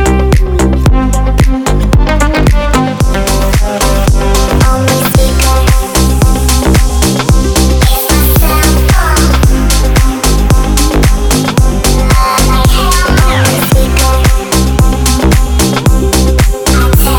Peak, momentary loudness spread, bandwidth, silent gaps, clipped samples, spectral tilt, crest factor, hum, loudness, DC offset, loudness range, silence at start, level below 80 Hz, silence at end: 0 dBFS; 2 LU; over 20 kHz; none; 0.4%; -5 dB/octave; 8 dB; none; -9 LUFS; under 0.1%; 1 LU; 0 s; -10 dBFS; 0 s